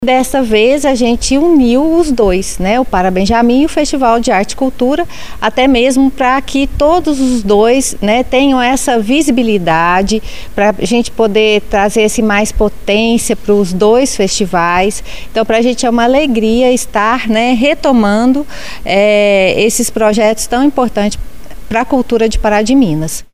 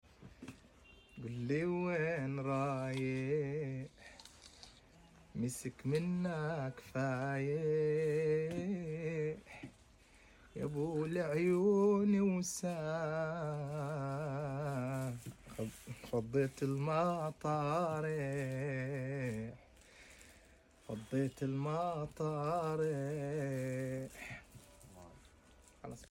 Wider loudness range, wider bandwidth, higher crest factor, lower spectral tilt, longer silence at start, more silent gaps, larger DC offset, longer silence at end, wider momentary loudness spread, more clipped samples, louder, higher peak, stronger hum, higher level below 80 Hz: second, 1 LU vs 7 LU; about the same, 16 kHz vs 16.5 kHz; about the same, 12 dB vs 16 dB; second, -4 dB/octave vs -7 dB/octave; second, 0 s vs 0.2 s; neither; first, 7% vs under 0.1%; about the same, 0 s vs 0.05 s; second, 6 LU vs 20 LU; neither; first, -11 LUFS vs -38 LUFS; first, 0 dBFS vs -22 dBFS; neither; first, -28 dBFS vs -66 dBFS